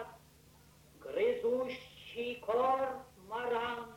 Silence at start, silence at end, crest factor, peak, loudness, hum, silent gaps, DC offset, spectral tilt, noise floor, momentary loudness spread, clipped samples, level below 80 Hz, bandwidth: 0 s; 0 s; 16 dB; -22 dBFS; -36 LUFS; none; none; under 0.1%; -4.5 dB/octave; -62 dBFS; 15 LU; under 0.1%; -68 dBFS; 16.5 kHz